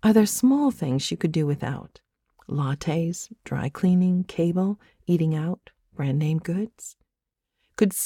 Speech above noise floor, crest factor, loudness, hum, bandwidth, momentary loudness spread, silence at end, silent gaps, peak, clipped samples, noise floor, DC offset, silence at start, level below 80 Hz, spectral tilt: 61 dB; 20 dB; -25 LUFS; none; 17.5 kHz; 14 LU; 0 s; none; -4 dBFS; under 0.1%; -85 dBFS; under 0.1%; 0.05 s; -58 dBFS; -6 dB/octave